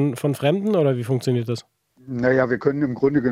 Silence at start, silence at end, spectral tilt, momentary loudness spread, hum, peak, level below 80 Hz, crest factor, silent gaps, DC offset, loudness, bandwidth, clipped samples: 0 s; 0 s; -7.5 dB/octave; 7 LU; none; -4 dBFS; -58 dBFS; 16 dB; none; under 0.1%; -21 LUFS; 16 kHz; under 0.1%